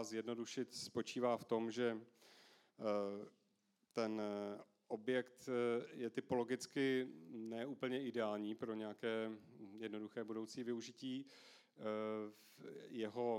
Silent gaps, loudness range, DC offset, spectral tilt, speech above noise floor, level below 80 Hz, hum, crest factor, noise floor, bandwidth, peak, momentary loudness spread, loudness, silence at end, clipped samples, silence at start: none; 5 LU; under 0.1%; -5 dB/octave; 38 dB; under -90 dBFS; none; 18 dB; -82 dBFS; 16 kHz; -26 dBFS; 14 LU; -44 LUFS; 0 s; under 0.1%; 0 s